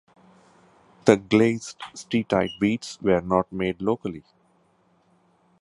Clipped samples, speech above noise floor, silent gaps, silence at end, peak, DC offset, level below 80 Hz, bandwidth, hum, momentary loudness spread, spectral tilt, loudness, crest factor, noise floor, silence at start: under 0.1%; 40 dB; none; 1.4 s; 0 dBFS; under 0.1%; -56 dBFS; 11.5 kHz; none; 14 LU; -6 dB/octave; -24 LUFS; 24 dB; -63 dBFS; 1.05 s